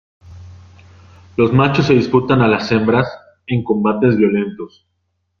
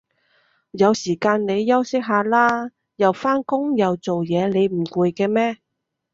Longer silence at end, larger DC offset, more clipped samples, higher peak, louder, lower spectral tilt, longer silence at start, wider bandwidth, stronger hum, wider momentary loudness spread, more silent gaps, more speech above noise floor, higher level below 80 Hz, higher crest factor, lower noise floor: first, 0.75 s vs 0.6 s; neither; neither; about the same, 0 dBFS vs -2 dBFS; first, -15 LUFS vs -20 LUFS; first, -8 dB/octave vs -6 dB/octave; second, 0.25 s vs 0.75 s; second, 7 kHz vs 7.8 kHz; neither; first, 13 LU vs 6 LU; neither; first, 55 dB vs 44 dB; first, -48 dBFS vs -64 dBFS; about the same, 16 dB vs 18 dB; first, -69 dBFS vs -63 dBFS